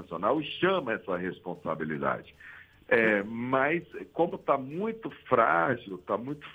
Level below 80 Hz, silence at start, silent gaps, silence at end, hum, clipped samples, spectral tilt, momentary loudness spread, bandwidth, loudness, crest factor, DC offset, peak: -66 dBFS; 0 s; none; 0 s; none; under 0.1%; -7.5 dB/octave; 13 LU; 16.5 kHz; -29 LUFS; 22 dB; under 0.1%; -8 dBFS